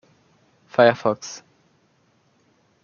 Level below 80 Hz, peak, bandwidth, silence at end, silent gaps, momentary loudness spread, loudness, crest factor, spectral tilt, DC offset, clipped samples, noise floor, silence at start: -72 dBFS; -2 dBFS; 7.2 kHz; 1.45 s; none; 20 LU; -20 LUFS; 22 dB; -5 dB/octave; under 0.1%; under 0.1%; -63 dBFS; 0.8 s